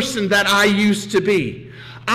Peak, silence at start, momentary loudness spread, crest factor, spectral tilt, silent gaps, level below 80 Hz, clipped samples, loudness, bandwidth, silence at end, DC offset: -8 dBFS; 0 s; 16 LU; 10 dB; -4 dB/octave; none; -52 dBFS; under 0.1%; -16 LUFS; 16 kHz; 0 s; under 0.1%